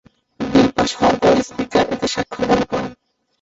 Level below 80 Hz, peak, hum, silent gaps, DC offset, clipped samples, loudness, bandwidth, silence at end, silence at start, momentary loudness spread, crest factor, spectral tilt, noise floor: -44 dBFS; -2 dBFS; none; none; under 0.1%; under 0.1%; -17 LUFS; 8 kHz; 0.5 s; 0.4 s; 9 LU; 16 dB; -5 dB/octave; -50 dBFS